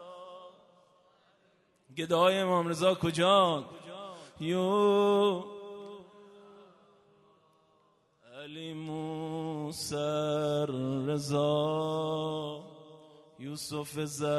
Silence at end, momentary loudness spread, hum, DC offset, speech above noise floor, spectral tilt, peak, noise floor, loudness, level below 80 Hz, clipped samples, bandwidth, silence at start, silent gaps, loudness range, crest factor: 0 s; 21 LU; none; under 0.1%; 39 dB; -5.5 dB/octave; -12 dBFS; -69 dBFS; -30 LUFS; -72 dBFS; under 0.1%; 12.5 kHz; 0 s; none; 15 LU; 20 dB